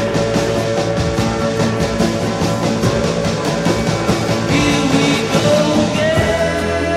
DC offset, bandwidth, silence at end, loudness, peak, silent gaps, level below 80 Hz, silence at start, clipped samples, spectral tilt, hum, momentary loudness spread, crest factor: under 0.1%; 15.5 kHz; 0 s; -16 LUFS; 0 dBFS; none; -34 dBFS; 0 s; under 0.1%; -5 dB/octave; none; 4 LU; 14 dB